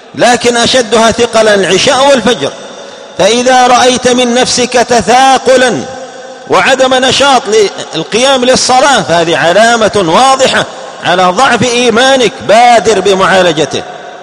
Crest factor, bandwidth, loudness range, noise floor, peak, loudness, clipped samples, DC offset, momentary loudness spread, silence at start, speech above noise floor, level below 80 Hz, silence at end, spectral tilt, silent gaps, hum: 8 dB; 13.5 kHz; 1 LU; -27 dBFS; 0 dBFS; -6 LUFS; 2%; under 0.1%; 11 LU; 0.15 s; 20 dB; -42 dBFS; 0 s; -2.5 dB/octave; none; none